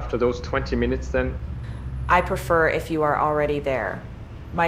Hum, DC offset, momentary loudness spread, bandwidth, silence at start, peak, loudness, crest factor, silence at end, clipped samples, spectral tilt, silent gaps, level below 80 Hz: none; under 0.1%; 13 LU; 15.5 kHz; 0 s; -6 dBFS; -23 LUFS; 18 dB; 0 s; under 0.1%; -6.5 dB/octave; none; -34 dBFS